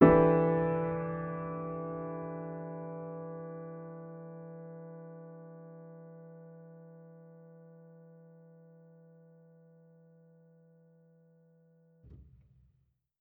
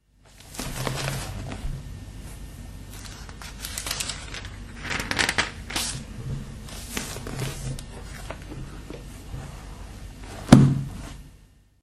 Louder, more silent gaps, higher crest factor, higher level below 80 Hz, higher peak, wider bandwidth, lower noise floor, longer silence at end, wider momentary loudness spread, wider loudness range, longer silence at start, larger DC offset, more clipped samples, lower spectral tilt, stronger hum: second, -34 LUFS vs -26 LUFS; neither; about the same, 26 dB vs 28 dB; second, -58 dBFS vs -40 dBFS; second, -8 dBFS vs 0 dBFS; second, 3.8 kHz vs 13.5 kHz; first, -74 dBFS vs -54 dBFS; first, 0.95 s vs 0.4 s; first, 26 LU vs 18 LU; first, 25 LU vs 11 LU; second, 0 s vs 0.25 s; neither; neither; first, -9.5 dB/octave vs -4.5 dB/octave; neither